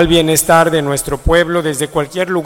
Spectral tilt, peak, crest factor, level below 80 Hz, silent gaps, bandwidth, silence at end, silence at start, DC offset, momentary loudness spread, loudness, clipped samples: -4 dB/octave; 0 dBFS; 12 dB; -28 dBFS; none; 17 kHz; 0 s; 0 s; under 0.1%; 7 LU; -13 LUFS; under 0.1%